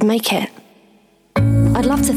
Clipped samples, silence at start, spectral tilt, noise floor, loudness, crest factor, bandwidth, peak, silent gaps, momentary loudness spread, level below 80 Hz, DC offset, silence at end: under 0.1%; 0 s; -5.5 dB/octave; -53 dBFS; -17 LUFS; 12 dB; 15.5 kHz; -4 dBFS; none; 9 LU; -32 dBFS; under 0.1%; 0 s